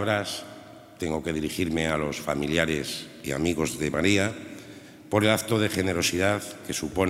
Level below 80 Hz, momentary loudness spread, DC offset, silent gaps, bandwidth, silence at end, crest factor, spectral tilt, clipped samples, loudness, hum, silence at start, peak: -52 dBFS; 15 LU; under 0.1%; none; 16 kHz; 0 s; 22 dB; -4.5 dB/octave; under 0.1%; -26 LUFS; none; 0 s; -6 dBFS